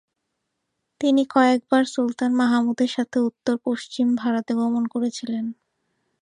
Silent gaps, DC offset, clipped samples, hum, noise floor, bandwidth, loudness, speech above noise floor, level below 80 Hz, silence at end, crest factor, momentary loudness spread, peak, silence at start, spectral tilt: none; under 0.1%; under 0.1%; none; -78 dBFS; 10 kHz; -22 LUFS; 57 dB; -74 dBFS; 0.7 s; 18 dB; 8 LU; -4 dBFS; 1 s; -4.5 dB/octave